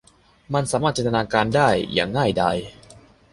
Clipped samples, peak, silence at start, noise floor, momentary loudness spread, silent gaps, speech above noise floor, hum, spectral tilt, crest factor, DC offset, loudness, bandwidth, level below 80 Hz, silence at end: under 0.1%; -2 dBFS; 0.5 s; -49 dBFS; 8 LU; none; 28 dB; none; -5 dB/octave; 20 dB; under 0.1%; -21 LUFS; 11.5 kHz; -48 dBFS; 0.4 s